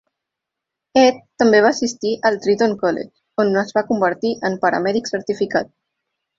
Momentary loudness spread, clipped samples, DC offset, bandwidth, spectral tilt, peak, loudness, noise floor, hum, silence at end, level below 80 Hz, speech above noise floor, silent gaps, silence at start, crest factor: 8 LU; under 0.1%; under 0.1%; 7.8 kHz; -4.5 dB/octave; -2 dBFS; -18 LUFS; -83 dBFS; none; 0.7 s; -60 dBFS; 65 dB; none; 0.95 s; 18 dB